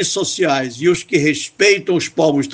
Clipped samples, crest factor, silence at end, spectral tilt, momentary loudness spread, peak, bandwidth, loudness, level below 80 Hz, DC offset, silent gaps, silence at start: under 0.1%; 16 dB; 0 s; -3.5 dB/octave; 4 LU; 0 dBFS; 9.8 kHz; -16 LUFS; -58 dBFS; under 0.1%; none; 0 s